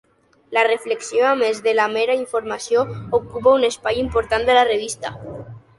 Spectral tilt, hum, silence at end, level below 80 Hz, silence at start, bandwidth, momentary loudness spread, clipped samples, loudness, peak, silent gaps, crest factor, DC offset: -3.5 dB/octave; none; 0.2 s; -46 dBFS; 0.5 s; 11.5 kHz; 11 LU; under 0.1%; -19 LUFS; -2 dBFS; none; 16 dB; under 0.1%